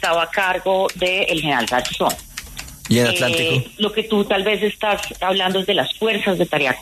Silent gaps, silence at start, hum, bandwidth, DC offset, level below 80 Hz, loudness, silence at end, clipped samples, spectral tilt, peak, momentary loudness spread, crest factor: none; 0 s; none; 13.5 kHz; under 0.1%; -46 dBFS; -18 LUFS; 0 s; under 0.1%; -4 dB/octave; -2 dBFS; 5 LU; 16 dB